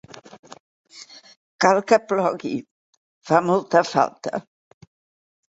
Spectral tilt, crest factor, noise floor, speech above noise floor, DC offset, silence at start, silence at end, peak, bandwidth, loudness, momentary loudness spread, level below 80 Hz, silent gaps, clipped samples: -5 dB/octave; 22 dB; -45 dBFS; 26 dB; under 0.1%; 0.15 s; 1.15 s; -2 dBFS; 8 kHz; -21 LUFS; 23 LU; -68 dBFS; 0.39-0.43 s, 0.60-0.84 s, 1.36-1.59 s, 2.71-3.21 s; under 0.1%